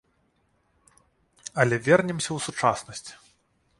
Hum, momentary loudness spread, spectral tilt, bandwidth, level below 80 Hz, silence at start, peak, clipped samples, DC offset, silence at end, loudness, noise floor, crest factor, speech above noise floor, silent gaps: none; 19 LU; -4.5 dB/octave; 11.5 kHz; -62 dBFS; 1.45 s; -4 dBFS; under 0.1%; under 0.1%; 0.65 s; -24 LUFS; -69 dBFS; 24 dB; 44 dB; none